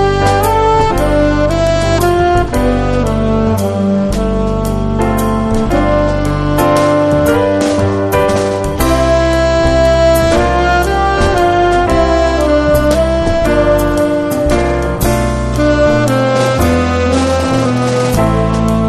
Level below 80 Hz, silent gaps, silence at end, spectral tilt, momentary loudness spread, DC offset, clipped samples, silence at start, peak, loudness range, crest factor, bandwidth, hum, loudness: -20 dBFS; none; 0 s; -6 dB/octave; 4 LU; under 0.1%; under 0.1%; 0 s; 0 dBFS; 3 LU; 10 dB; 13.5 kHz; none; -12 LUFS